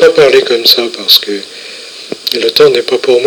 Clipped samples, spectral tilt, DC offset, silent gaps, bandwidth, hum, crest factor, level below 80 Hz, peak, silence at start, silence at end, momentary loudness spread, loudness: 3%; -2.5 dB/octave; under 0.1%; none; over 20 kHz; none; 10 dB; -52 dBFS; 0 dBFS; 0 s; 0 s; 18 LU; -8 LUFS